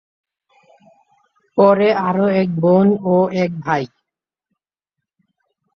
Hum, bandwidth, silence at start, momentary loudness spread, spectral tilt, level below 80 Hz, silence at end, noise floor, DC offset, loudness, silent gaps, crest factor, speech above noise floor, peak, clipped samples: none; 6.4 kHz; 1.55 s; 9 LU; -8.5 dB/octave; -62 dBFS; 1.9 s; -83 dBFS; under 0.1%; -16 LUFS; none; 16 dB; 68 dB; -2 dBFS; under 0.1%